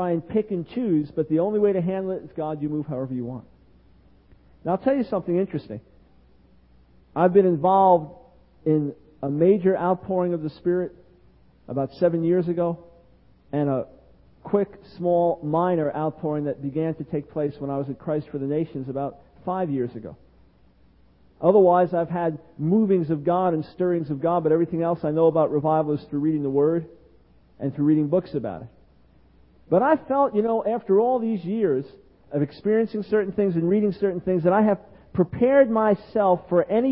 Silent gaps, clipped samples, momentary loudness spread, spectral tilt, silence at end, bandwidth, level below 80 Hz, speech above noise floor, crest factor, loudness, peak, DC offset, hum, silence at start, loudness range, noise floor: none; under 0.1%; 12 LU; -13 dB/octave; 0 s; 5.6 kHz; -58 dBFS; 35 dB; 20 dB; -23 LUFS; -4 dBFS; under 0.1%; none; 0 s; 7 LU; -57 dBFS